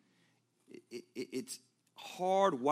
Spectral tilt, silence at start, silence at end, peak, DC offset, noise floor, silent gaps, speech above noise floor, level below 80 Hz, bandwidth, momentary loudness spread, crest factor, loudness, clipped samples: -4.5 dB/octave; 0.9 s; 0 s; -16 dBFS; under 0.1%; -74 dBFS; none; 40 dB; under -90 dBFS; 15.5 kHz; 19 LU; 22 dB; -35 LUFS; under 0.1%